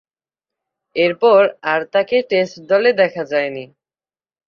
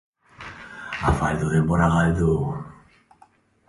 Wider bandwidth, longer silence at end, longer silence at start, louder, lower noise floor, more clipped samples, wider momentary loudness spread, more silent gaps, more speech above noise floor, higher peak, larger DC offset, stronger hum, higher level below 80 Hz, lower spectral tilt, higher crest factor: second, 7 kHz vs 11.5 kHz; about the same, 0.85 s vs 0.95 s; first, 0.95 s vs 0.4 s; first, -16 LUFS vs -22 LUFS; first, under -90 dBFS vs -57 dBFS; neither; second, 9 LU vs 20 LU; neither; first, over 74 dB vs 37 dB; first, -2 dBFS vs -6 dBFS; neither; neither; second, -66 dBFS vs -36 dBFS; second, -5.5 dB/octave vs -7.5 dB/octave; about the same, 16 dB vs 18 dB